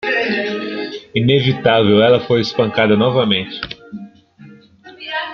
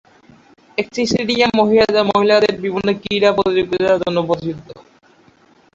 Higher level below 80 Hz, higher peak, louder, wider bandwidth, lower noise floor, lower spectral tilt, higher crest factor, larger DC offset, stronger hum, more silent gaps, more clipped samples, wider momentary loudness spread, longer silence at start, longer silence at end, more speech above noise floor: about the same, -52 dBFS vs -50 dBFS; about the same, -2 dBFS vs -2 dBFS; about the same, -15 LUFS vs -16 LUFS; second, 6.8 kHz vs 7.8 kHz; second, -42 dBFS vs -51 dBFS; first, -7 dB/octave vs -5 dB/octave; about the same, 16 dB vs 16 dB; neither; neither; neither; neither; first, 16 LU vs 10 LU; second, 0 s vs 0.8 s; second, 0 s vs 0.95 s; second, 29 dB vs 36 dB